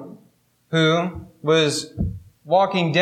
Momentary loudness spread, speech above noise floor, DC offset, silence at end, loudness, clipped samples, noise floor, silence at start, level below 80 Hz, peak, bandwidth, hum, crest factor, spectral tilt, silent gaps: 11 LU; 40 dB; under 0.1%; 0 s; -21 LUFS; under 0.1%; -59 dBFS; 0 s; -44 dBFS; -6 dBFS; 14 kHz; none; 16 dB; -5 dB/octave; none